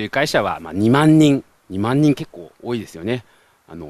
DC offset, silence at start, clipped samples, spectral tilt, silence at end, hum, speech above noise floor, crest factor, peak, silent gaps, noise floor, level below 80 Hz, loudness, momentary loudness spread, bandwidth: under 0.1%; 0 s; under 0.1%; -6.5 dB/octave; 0 s; none; 21 dB; 18 dB; 0 dBFS; none; -39 dBFS; -52 dBFS; -18 LUFS; 15 LU; 13.5 kHz